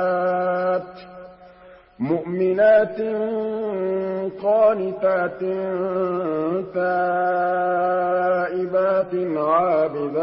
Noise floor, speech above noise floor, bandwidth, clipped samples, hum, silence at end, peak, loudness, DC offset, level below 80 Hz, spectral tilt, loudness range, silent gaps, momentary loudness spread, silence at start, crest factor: -47 dBFS; 27 dB; 5.6 kHz; under 0.1%; none; 0 s; -6 dBFS; -21 LUFS; under 0.1%; -62 dBFS; -11.5 dB/octave; 2 LU; none; 7 LU; 0 s; 14 dB